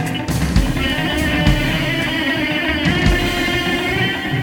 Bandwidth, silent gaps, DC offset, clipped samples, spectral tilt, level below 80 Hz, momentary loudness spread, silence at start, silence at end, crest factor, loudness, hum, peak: 19 kHz; none; under 0.1%; under 0.1%; -5 dB/octave; -26 dBFS; 3 LU; 0 s; 0 s; 16 dB; -17 LUFS; none; 0 dBFS